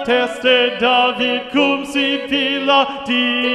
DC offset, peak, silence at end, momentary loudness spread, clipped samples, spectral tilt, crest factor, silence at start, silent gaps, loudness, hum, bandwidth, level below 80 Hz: under 0.1%; -2 dBFS; 0 s; 4 LU; under 0.1%; -3.5 dB/octave; 14 dB; 0 s; none; -15 LUFS; none; 12.5 kHz; -56 dBFS